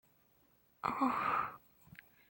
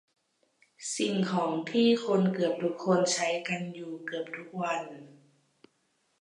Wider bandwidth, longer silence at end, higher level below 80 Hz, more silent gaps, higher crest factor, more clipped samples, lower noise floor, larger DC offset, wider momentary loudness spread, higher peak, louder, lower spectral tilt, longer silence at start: first, 16.5 kHz vs 11 kHz; second, 0.75 s vs 1.1 s; first, -74 dBFS vs -82 dBFS; neither; about the same, 20 dB vs 16 dB; neither; about the same, -71 dBFS vs -74 dBFS; neither; first, 24 LU vs 13 LU; second, -20 dBFS vs -14 dBFS; second, -36 LUFS vs -29 LUFS; first, -6 dB/octave vs -4.5 dB/octave; about the same, 0.85 s vs 0.8 s